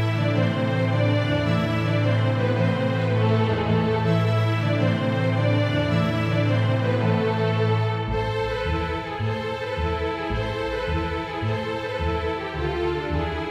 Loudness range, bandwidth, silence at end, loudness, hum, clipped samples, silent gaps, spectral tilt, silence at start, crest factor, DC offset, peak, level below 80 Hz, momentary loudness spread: 5 LU; 7.8 kHz; 0 s; -23 LUFS; none; under 0.1%; none; -7.5 dB/octave; 0 s; 14 dB; under 0.1%; -8 dBFS; -38 dBFS; 5 LU